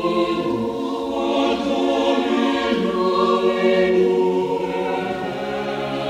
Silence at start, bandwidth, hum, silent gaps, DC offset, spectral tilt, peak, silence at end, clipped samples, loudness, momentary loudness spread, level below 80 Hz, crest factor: 0 s; 11 kHz; none; none; under 0.1%; -6 dB/octave; -6 dBFS; 0 s; under 0.1%; -20 LUFS; 8 LU; -52 dBFS; 14 dB